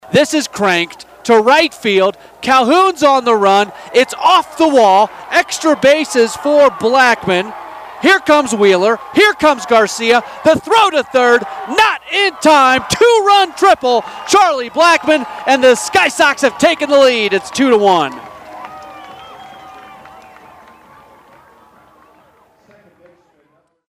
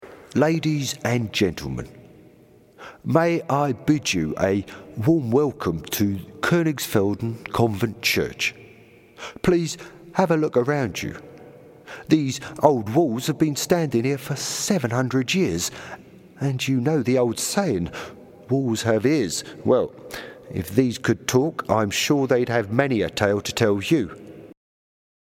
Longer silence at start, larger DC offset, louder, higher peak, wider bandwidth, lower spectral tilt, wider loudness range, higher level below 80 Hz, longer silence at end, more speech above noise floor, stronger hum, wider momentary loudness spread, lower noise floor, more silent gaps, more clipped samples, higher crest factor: about the same, 0.1 s vs 0 s; neither; first, -11 LUFS vs -22 LUFS; about the same, 0 dBFS vs 0 dBFS; about the same, 15.5 kHz vs 17 kHz; second, -3 dB/octave vs -5 dB/octave; about the same, 2 LU vs 3 LU; about the same, -52 dBFS vs -52 dBFS; first, 4.2 s vs 0.8 s; first, 46 dB vs 30 dB; neither; second, 7 LU vs 12 LU; first, -57 dBFS vs -52 dBFS; neither; neither; second, 12 dB vs 22 dB